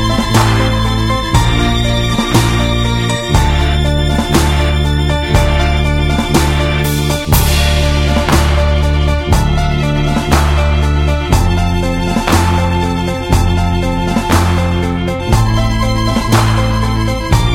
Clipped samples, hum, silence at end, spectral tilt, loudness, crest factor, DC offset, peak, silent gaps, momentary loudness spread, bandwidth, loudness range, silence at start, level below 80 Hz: under 0.1%; none; 0 s; -5.5 dB/octave; -13 LUFS; 12 dB; under 0.1%; 0 dBFS; none; 3 LU; 17 kHz; 1 LU; 0 s; -18 dBFS